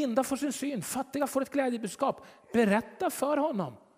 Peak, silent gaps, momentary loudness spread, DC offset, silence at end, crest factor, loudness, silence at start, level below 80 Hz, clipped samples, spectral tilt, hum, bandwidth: -12 dBFS; none; 7 LU; under 0.1%; 0.2 s; 18 dB; -30 LUFS; 0 s; -70 dBFS; under 0.1%; -5 dB/octave; none; 16 kHz